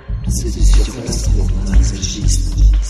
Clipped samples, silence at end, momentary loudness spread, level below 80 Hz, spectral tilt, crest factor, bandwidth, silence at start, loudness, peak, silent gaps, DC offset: under 0.1%; 0 s; 5 LU; -14 dBFS; -5 dB/octave; 12 dB; 12.5 kHz; 0.05 s; -17 LUFS; 0 dBFS; none; under 0.1%